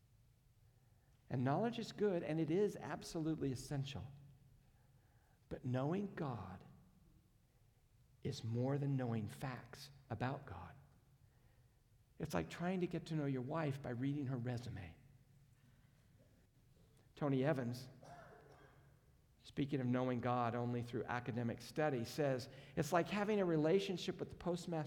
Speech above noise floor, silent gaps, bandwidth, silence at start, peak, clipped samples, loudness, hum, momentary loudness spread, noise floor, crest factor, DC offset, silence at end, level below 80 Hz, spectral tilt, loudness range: 31 dB; none; 18 kHz; 1.3 s; -22 dBFS; under 0.1%; -42 LUFS; none; 14 LU; -72 dBFS; 22 dB; under 0.1%; 0 s; -72 dBFS; -7 dB/octave; 8 LU